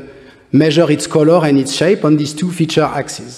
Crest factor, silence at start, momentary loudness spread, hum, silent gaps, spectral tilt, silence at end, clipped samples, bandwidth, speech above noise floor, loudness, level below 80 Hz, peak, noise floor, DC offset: 14 dB; 0 s; 7 LU; none; none; -5.5 dB/octave; 0 s; under 0.1%; 13.5 kHz; 26 dB; -13 LUFS; -52 dBFS; 0 dBFS; -38 dBFS; under 0.1%